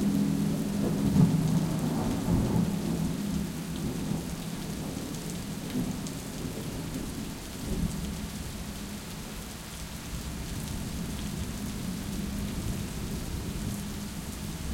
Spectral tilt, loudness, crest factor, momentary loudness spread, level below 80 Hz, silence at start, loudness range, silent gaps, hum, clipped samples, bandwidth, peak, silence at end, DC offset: -5.5 dB/octave; -32 LUFS; 20 dB; 11 LU; -42 dBFS; 0 s; 9 LU; none; none; under 0.1%; 17 kHz; -10 dBFS; 0 s; under 0.1%